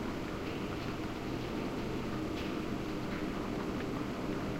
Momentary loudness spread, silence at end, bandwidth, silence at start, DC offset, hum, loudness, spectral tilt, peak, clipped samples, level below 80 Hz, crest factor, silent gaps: 1 LU; 0 s; 16 kHz; 0 s; under 0.1%; none; -38 LUFS; -6 dB/octave; -24 dBFS; under 0.1%; -50 dBFS; 14 dB; none